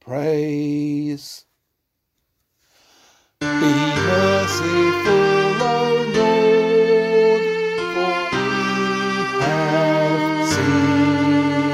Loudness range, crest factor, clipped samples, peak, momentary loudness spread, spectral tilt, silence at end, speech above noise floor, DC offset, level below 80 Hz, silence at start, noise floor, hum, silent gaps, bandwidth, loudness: 9 LU; 14 dB; under 0.1%; -6 dBFS; 7 LU; -5.5 dB/octave; 0 s; 52 dB; under 0.1%; -56 dBFS; 0.05 s; -75 dBFS; none; none; 15 kHz; -18 LUFS